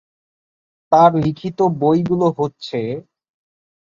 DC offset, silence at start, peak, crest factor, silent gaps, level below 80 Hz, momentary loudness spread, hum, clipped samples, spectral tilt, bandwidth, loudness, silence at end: under 0.1%; 0.9 s; -2 dBFS; 16 dB; none; -56 dBFS; 12 LU; none; under 0.1%; -8.5 dB/octave; 7.4 kHz; -17 LUFS; 0.85 s